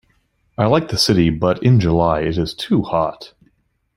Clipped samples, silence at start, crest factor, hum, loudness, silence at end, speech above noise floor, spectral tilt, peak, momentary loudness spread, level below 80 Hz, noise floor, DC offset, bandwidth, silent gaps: under 0.1%; 0.6 s; 16 dB; none; -17 LUFS; 0.7 s; 46 dB; -6 dB/octave; -2 dBFS; 7 LU; -40 dBFS; -62 dBFS; under 0.1%; 15.5 kHz; none